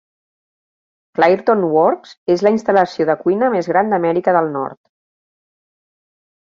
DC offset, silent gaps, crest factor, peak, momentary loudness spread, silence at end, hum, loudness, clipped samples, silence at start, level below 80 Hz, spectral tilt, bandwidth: under 0.1%; 2.17-2.26 s; 16 dB; -2 dBFS; 8 LU; 1.75 s; none; -16 LUFS; under 0.1%; 1.2 s; -64 dBFS; -7 dB/octave; 7.4 kHz